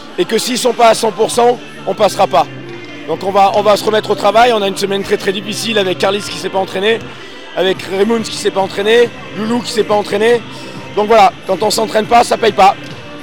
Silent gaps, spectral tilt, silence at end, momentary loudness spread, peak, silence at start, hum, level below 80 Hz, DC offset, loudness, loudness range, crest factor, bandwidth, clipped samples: none; -3.5 dB/octave; 0 s; 12 LU; 0 dBFS; 0 s; none; -48 dBFS; 2%; -13 LUFS; 3 LU; 12 dB; 18.5 kHz; under 0.1%